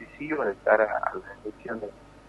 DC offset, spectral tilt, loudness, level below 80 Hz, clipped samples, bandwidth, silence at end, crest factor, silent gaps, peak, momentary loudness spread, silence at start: under 0.1%; -7 dB/octave; -27 LUFS; -58 dBFS; under 0.1%; 8.4 kHz; 0.1 s; 22 dB; none; -6 dBFS; 17 LU; 0 s